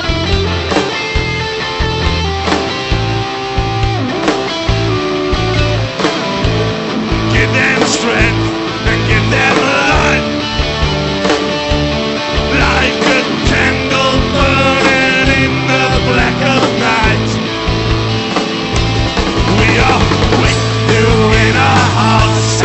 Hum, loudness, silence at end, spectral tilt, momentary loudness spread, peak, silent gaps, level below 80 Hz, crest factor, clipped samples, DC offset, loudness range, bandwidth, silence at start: none; -12 LUFS; 0 s; -5 dB/octave; 6 LU; 0 dBFS; none; -22 dBFS; 12 dB; under 0.1%; under 0.1%; 4 LU; 8.4 kHz; 0 s